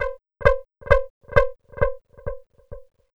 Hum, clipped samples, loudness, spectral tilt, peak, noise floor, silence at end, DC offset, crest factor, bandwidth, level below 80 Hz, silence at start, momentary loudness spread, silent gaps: none; under 0.1%; -23 LUFS; -7 dB/octave; 0 dBFS; -42 dBFS; 0.35 s; under 0.1%; 24 dB; 7.2 kHz; -32 dBFS; 0 s; 15 LU; 1.10-1.21 s